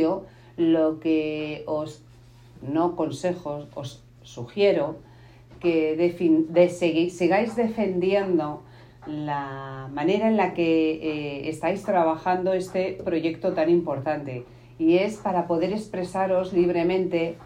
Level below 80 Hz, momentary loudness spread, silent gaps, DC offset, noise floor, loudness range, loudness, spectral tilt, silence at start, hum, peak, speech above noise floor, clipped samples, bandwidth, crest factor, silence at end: -58 dBFS; 13 LU; none; under 0.1%; -50 dBFS; 5 LU; -24 LUFS; -7 dB/octave; 0 s; none; -6 dBFS; 26 dB; under 0.1%; 10.5 kHz; 18 dB; 0 s